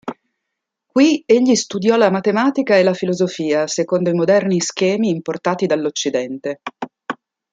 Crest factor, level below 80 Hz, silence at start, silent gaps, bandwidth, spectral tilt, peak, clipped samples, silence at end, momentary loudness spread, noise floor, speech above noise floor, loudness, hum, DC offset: 16 dB; -66 dBFS; 0.05 s; none; 9.4 kHz; -5 dB/octave; -2 dBFS; under 0.1%; 0.4 s; 14 LU; -79 dBFS; 63 dB; -17 LUFS; none; under 0.1%